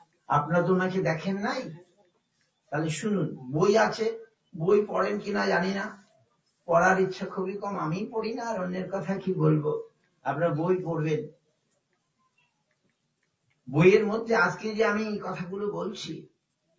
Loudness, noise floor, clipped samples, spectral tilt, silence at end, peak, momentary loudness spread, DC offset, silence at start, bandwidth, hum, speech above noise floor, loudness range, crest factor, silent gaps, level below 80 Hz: -27 LUFS; -76 dBFS; under 0.1%; -6.5 dB/octave; 0.55 s; -8 dBFS; 12 LU; under 0.1%; 0.3 s; 8 kHz; none; 50 dB; 4 LU; 20 dB; none; -66 dBFS